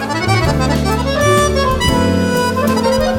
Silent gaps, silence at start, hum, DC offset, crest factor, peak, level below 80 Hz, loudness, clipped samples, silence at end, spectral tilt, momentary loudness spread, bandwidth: none; 0 s; none; under 0.1%; 12 dB; -2 dBFS; -26 dBFS; -14 LUFS; under 0.1%; 0 s; -5 dB/octave; 3 LU; 17.5 kHz